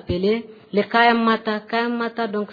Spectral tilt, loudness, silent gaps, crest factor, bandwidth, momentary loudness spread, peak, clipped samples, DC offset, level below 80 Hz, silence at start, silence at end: -7.5 dB/octave; -20 LUFS; none; 18 dB; 5 kHz; 9 LU; -2 dBFS; under 0.1%; under 0.1%; -50 dBFS; 0.1 s; 0 s